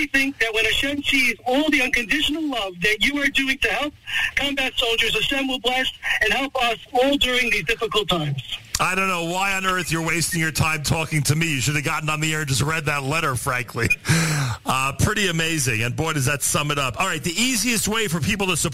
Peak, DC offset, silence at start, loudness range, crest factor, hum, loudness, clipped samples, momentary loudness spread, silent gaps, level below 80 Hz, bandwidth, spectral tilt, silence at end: -6 dBFS; 0.9%; 0 s; 2 LU; 16 dB; none; -20 LUFS; under 0.1%; 4 LU; none; -42 dBFS; 16 kHz; -3.5 dB/octave; 0 s